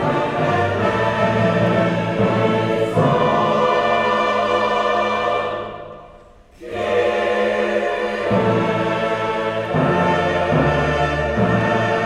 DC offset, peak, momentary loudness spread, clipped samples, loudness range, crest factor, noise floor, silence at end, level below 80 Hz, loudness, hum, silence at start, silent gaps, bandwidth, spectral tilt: under 0.1%; -4 dBFS; 4 LU; under 0.1%; 4 LU; 14 dB; -45 dBFS; 0 s; -40 dBFS; -18 LUFS; none; 0 s; none; 12 kHz; -6.5 dB/octave